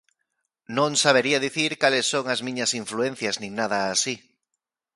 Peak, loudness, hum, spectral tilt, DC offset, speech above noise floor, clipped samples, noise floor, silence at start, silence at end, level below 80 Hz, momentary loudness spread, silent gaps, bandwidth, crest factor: -4 dBFS; -23 LUFS; none; -2.5 dB/octave; under 0.1%; 59 dB; under 0.1%; -83 dBFS; 0.7 s; 0.8 s; -70 dBFS; 9 LU; none; 11.5 kHz; 22 dB